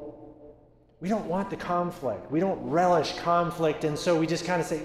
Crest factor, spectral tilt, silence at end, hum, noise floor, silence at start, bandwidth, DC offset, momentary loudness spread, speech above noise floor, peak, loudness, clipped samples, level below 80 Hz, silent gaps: 16 dB; -5.5 dB/octave; 0 s; none; -57 dBFS; 0 s; 14 kHz; under 0.1%; 8 LU; 30 dB; -12 dBFS; -27 LUFS; under 0.1%; -56 dBFS; none